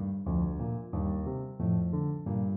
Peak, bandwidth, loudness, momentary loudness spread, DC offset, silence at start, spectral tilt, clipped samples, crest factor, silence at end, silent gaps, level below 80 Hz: -18 dBFS; 2 kHz; -32 LUFS; 5 LU; under 0.1%; 0 s; -14.5 dB/octave; under 0.1%; 12 dB; 0 s; none; -42 dBFS